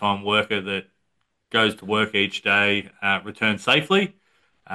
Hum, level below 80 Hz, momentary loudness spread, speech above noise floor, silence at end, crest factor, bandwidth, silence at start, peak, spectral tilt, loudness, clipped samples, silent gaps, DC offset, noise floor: none; -66 dBFS; 7 LU; 52 dB; 0 s; 20 dB; 12.5 kHz; 0 s; -4 dBFS; -4.5 dB/octave; -21 LUFS; under 0.1%; none; under 0.1%; -74 dBFS